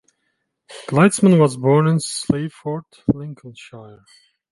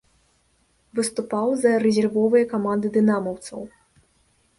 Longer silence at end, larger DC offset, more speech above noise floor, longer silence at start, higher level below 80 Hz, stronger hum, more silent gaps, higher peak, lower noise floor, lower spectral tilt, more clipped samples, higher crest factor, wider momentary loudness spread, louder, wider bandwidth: second, 0.65 s vs 0.9 s; neither; first, 54 dB vs 43 dB; second, 0.7 s vs 0.95 s; first, -52 dBFS vs -64 dBFS; neither; neither; first, -2 dBFS vs -6 dBFS; first, -72 dBFS vs -64 dBFS; about the same, -6.5 dB/octave vs -5.5 dB/octave; neither; about the same, 18 dB vs 16 dB; first, 24 LU vs 15 LU; first, -18 LUFS vs -21 LUFS; about the same, 11.5 kHz vs 11.5 kHz